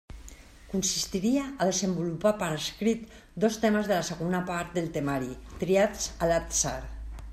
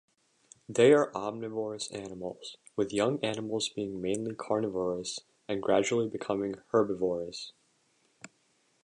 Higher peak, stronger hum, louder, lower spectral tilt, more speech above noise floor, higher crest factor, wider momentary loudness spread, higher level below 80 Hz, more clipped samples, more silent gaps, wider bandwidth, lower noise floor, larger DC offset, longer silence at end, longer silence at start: about the same, -12 dBFS vs -10 dBFS; neither; first, -28 LUFS vs -31 LUFS; about the same, -4 dB/octave vs -4.5 dB/octave; second, 20 dB vs 41 dB; about the same, 18 dB vs 20 dB; second, 11 LU vs 14 LU; first, -46 dBFS vs -68 dBFS; neither; neither; first, 16 kHz vs 11 kHz; second, -48 dBFS vs -71 dBFS; neither; second, 0 s vs 0.55 s; second, 0.1 s vs 0.7 s